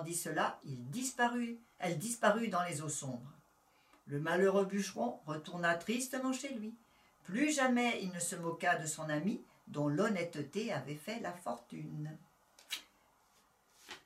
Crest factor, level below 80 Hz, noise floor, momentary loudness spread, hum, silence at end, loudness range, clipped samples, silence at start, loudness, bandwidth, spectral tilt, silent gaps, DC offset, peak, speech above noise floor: 22 dB; -82 dBFS; -71 dBFS; 14 LU; none; 0.05 s; 5 LU; under 0.1%; 0 s; -37 LUFS; 16 kHz; -4 dB/octave; none; under 0.1%; -16 dBFS; 34 dB